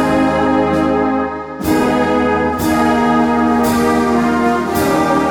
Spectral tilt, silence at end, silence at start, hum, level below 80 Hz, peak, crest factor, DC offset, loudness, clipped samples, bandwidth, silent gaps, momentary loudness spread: -5.5 dB/octave; 0 s; 0 s; none; -36 dBFS; -4 dBFS; 10 dB; under 0.1%; -14 LUFS; under 0.1%; 17.5 kHz; none; 3 LU